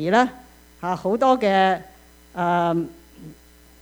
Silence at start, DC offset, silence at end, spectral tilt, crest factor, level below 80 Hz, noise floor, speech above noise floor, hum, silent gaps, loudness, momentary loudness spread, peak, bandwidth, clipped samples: 0 s; under 0.1%; 0.5 s; -6 dB/octave; 18 dB; -54 dBFS; -49 dBFS; 29 dB; none; none; -21 LUFS; 13 LU; -4 dBFS; over 20 kHz; under 0.1%